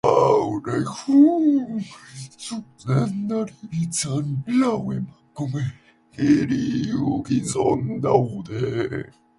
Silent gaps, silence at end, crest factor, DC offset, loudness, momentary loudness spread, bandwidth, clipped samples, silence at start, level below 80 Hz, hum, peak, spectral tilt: none; 0.3 s; 20 dB; under 0.1%; -22 LUFS; 15 LU; 11.5 kHz; under 0.1%; 0.05 s; -54 dBFS; none; -2 dBFS; -6.5 dB/octave